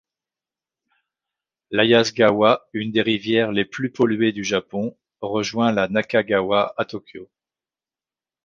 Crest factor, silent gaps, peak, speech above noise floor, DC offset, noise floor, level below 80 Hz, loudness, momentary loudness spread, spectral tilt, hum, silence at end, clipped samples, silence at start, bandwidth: 20 dB; none; -2 dBFS; over 70 dB; under 0.1%; under -90 dBFS; -60 dBFS; -20 LUFS; 12 LU; -5 dB/octave; none; 1.2 s; under 0.1%; 1.7 s; 7.2 kHz